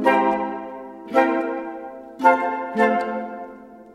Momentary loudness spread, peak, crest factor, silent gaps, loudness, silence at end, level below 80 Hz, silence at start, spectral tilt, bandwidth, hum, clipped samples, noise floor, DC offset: 18 LU; -2 dBFS; 20 dB; none; -21 LUFS; 0 s; -64 dBFS; 0 s; -6 dB/octave; 12.5 kHz; none; under 0.1%; -41 dBFS; under 0.1%